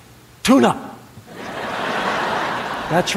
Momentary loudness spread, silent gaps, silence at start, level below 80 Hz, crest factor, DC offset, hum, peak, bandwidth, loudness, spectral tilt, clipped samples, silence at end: 21 LU; none; 0.1 s; -50 dBFS; 18 dB; under 0.1%; none; -2 dBFS; 16 kHz; -20 LUFS; -4.5 dB/octave; under 0.1%; 0 s